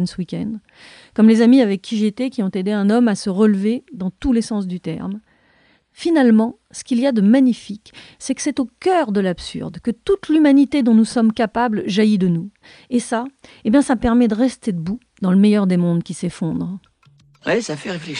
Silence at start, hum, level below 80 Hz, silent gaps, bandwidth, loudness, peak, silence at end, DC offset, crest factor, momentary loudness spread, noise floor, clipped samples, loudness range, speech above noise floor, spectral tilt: 0 s; none; -48 dBFS; none; 10.5 kHz; -18 LUFS; -2 dBFS; 0 s; under 0.1%; 16 dB; 14 LU; -57 dBFS; under 0.1%; 3 LU; 40 dB; -6.5 dB/octave